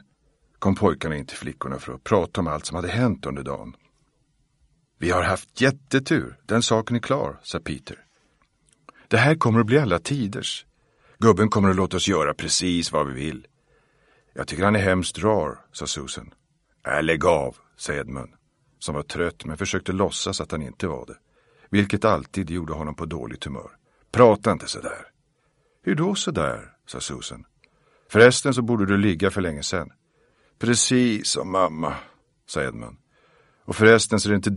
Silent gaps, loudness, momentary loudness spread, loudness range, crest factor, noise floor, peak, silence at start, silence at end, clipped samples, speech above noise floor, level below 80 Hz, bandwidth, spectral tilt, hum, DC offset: none; -23 LUFS; 16 LU; 6 LU; 24 dB; -67 dBFS; 0 dBFS; 0.6 s; 0 s; under 0.1%; 45 dB; -48 dBFS; 11.5 kHz; -4.5 dB/octave; none; under 0.1%